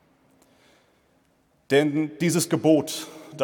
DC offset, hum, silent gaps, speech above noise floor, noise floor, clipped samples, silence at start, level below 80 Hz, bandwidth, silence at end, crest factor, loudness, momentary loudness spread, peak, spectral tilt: under 0.1%; none; none; 43 dB; -65 dBFS; under 0.1%; 1.7 s; -72 dBFS; 19 kHz; 0 s; 20 dB; -23 LUFS; 12 LU; -6 dBFS; -5 dB/octave